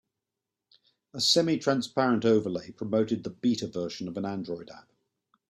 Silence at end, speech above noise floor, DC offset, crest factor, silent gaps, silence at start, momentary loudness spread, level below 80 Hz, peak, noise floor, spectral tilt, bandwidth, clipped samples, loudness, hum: 0.7 s; 60 dB; under 0.1%; 20 dB; none; 1.15 s; 13 LU; -70 dBFS; -10 dBFS; -88 dBFS; -4.5 dB/octave; 14.5 kHz; under 0.1%; -28 LUFS; none